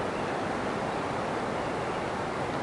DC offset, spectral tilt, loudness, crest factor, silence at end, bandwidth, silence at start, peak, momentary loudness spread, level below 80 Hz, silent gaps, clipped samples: under 0.1%; -5.5 dB/octave; -31 LUFS; 12 dB; 0 s; 11.5 kHz; 0 s; -20 dBFS; 1 LU; -54 dBFS; none; under 0.1%